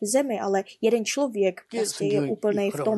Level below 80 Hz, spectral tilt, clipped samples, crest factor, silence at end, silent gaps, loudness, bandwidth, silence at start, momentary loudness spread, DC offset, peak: -76 dBFS; -4.5 dB/octave; under 0.1%; 14 dB; 0 s; none; -25 LUFS; 12.5 kHz; 0 s; 3 LU; under 0.1%; -10 dBFS